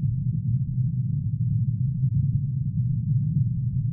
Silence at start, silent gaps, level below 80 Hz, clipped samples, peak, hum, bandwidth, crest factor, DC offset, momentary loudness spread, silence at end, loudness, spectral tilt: 0 s; none; -42 dBFS; under 0.1%; -12 dBFS; none; 0.4 kHz; 12 dB; under 0.1%; 2 LU; 0 s; -25 LUFS; -20 dB/octave